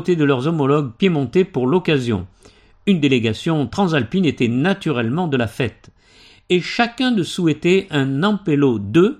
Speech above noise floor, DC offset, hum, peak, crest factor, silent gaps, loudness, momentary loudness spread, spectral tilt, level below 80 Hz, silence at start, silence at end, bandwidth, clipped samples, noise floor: 32 dB; under 0.1%; none; -2 dBFS; 16 dB; none; -18 LUFS; 4 LU; -6.5 dB/octave; -52 dBFS; 0 s; 0.05 s; 12.5 kHz; under 0.1%; -49 dBFS